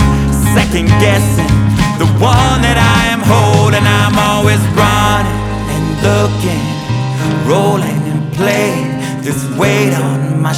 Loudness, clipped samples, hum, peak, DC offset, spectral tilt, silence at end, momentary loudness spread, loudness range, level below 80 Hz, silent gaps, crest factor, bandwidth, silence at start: -11 LUFS; under 0.1%; none; 0 dBFS; under 0.1%; -5.5 dB/octave; 0 s; 7 LU; 4 LU; -24 dBFS; none; 10 dB; 16 kHz; 0 s